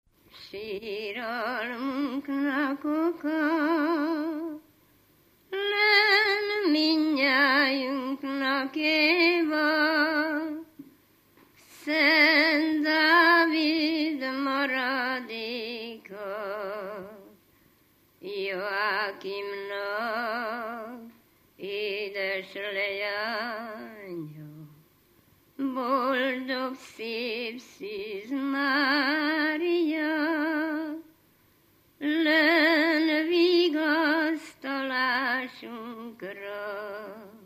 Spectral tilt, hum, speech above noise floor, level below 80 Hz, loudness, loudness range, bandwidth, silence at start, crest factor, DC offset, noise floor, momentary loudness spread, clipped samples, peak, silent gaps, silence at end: -4 dB/octave; none; 33 dB; -76 dBFS; -26 LUFS; 10 LU; 15 kHz; 0.35 s; 20 dB; under 0.1%; -63 dBFS; 19 LU; under 0.1%; -8 dBFS; none; 0.1 s